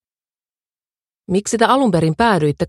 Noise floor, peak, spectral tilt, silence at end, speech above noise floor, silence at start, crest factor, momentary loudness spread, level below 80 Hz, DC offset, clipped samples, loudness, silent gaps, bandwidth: under -90 dBFS; 0 dBFS; -5.5 dB/octave; 0 s; over 75 dB; 1.3 s; 18 dB; 7 LU; -48 dBFS; under 0.1%; under 0.1%; -16 LUFS; none; 12.5 kHz